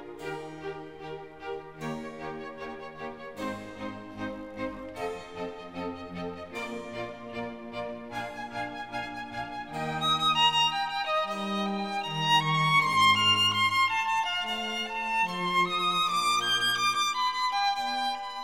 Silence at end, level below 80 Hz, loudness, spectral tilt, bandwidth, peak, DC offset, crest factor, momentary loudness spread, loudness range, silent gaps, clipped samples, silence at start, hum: 0 s; -62 dBFS; -28 LUFS; -3 dB/octave; 17.5 kHz; -12 dBFS; 0.1%; 18 dB; 17 LU; 14 LU; none; under 0.1%; 0 s; none